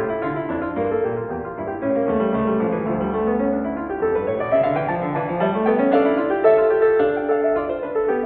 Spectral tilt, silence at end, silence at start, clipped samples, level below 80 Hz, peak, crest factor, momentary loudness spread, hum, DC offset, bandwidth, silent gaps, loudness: -11 dB/octave; 0 s; 0 s; under 0.1%; -48 dBFS; -4 dBFS; 16 dB; 8 LU; none; under 0.1%; 4.3 kHz; none; -20 LUFS